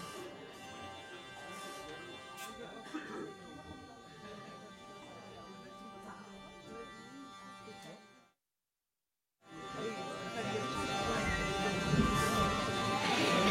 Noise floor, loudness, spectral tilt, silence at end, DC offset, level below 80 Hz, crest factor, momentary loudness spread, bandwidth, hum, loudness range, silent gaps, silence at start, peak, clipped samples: under -90 dBFS; -37 LUFS; -4.5 dB/octave; 0 s; under 0.1%; -54 dBFS; 22 dB; 20 LU; 16 kHz; none; 17 LU; none; 0 s; -18 dBFS; under 0.1%